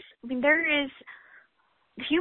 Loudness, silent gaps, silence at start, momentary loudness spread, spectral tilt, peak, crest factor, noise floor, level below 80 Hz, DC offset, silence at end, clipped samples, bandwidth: -26 LUFS; none; 0.25 s; 23 LU; -7.5 dB/octave; -12 dBFS; 18 dB; -70 dBFS; -64 dBFS; under 0.1%; 0 s; under 0.1%; 4.3 kHz